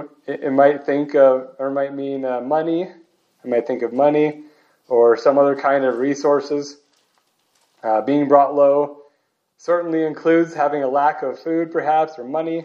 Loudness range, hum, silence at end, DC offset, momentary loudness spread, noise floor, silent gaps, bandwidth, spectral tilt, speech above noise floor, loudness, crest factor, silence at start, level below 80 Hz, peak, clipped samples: 3 LU; none; 0 s; under 0.1%; 11 LU; -68 dBFS; none; 7.2 kHz; -6.5 dB/octave; 50 dB; -18 LUFS; 18 dB; 0 s; -80 dBFS; 0 dBFS; under 0.1%